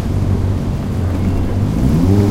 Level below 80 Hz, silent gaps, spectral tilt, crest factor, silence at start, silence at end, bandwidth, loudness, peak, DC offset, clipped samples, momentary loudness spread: -22 dBFS; none; -8.5 dB/octave; 12 dB; 0 s; 0 s; 13.5 kHz; -16 LUFS; -2 dBFS; under 0.1%; under 0.1%; 6 LU